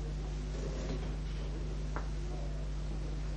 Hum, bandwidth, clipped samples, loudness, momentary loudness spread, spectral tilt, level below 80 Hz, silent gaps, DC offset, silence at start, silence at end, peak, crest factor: none; 8.6 kHz; under 0.1%; -40 LUFS; 2 LU; -6.5 dB/octave; -38 dBFS; none; under 0.1%; 0 s; 0 s; -24 dBFS; 14 dB